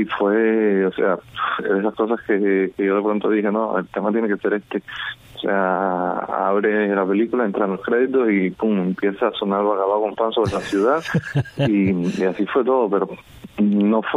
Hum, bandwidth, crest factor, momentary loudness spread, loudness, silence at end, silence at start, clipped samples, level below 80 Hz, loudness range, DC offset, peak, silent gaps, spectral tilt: none; 11 kHz; 14 dB; 5 LU; -20 LUFS; 0 s; 0 s; under 0.1%; -56 dBFS; 2 LU; under 0.1%; -6 dBFS; none; -7.5 dB/octave